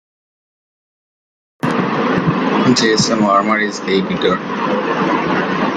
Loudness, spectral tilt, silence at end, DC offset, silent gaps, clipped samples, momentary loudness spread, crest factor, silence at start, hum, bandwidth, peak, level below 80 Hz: -15 LUFS; -4.5 dB/octave; 0 s; under 0.1%; none; under 0.1%; 6 LU; 14 dB; 1.65 s; none; 11 kHz; -2 dBFS; -52 dBFS